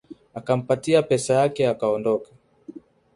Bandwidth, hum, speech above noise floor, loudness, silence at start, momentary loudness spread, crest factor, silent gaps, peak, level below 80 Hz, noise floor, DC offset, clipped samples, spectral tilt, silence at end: 11.5 kHz; none; 22 dB; -22 LUFS; 0.1 s; 8 LU; 18 dB; none; -6 dBFS; -62 dBFS; -44 dBFS; under 0.1%; under 0.1%; -5.5 dB/octave; 0.35 s